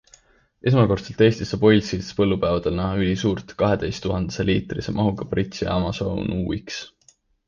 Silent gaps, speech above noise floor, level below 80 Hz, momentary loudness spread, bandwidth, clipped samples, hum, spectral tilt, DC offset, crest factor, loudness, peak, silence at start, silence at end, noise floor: none; 38 dB; -40 dBFS; 9 LU; 7.4 kHz; under 0.1%; none; -6.5 dB/octave; under 0.1%; 18 dB; -22 LUFS; -4 dBFS; 0.65 s; 0.6 s; -59 dBFS